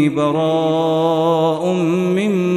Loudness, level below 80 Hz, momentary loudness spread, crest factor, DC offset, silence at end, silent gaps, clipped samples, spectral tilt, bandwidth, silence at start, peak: -16 LUFS; -62 dBFS; 2 LU; 10 dB; under 0.1%; 0 s; none; under 0.1%; -7 dB/octave; 13 kHz; 0 s; -4 dBFS